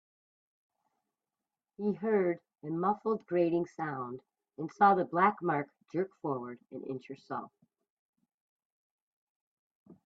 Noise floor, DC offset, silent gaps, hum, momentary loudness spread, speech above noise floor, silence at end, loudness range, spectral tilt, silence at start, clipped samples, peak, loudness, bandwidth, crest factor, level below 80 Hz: under -90 dBFS; under 0.1%; 7.90-8.13 s, 8.34-8.59 s, 8.65-9.86 s; none; 16 LU; over 58 dB; 0.15 s; 14 LU; -8.5 dB/octave; 1.8 s; under 0.1%; -12 dBFS; -32 LUFS; 7 kHz; 22 dB; -80 dBFS